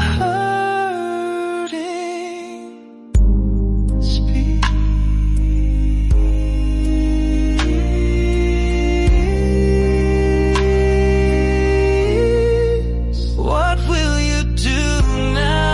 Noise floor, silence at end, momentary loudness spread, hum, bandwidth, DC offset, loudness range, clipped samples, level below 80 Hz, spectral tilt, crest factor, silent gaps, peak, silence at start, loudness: -37 dBFS; 0 s; 7 LU; none; 11.5 kHz; under 0.1%; 5 LU; under 0.1%; -18 dBFS; -6.5 dB/octave; 12 dB; none; -4 dBFS; 0 s; -18 LUFS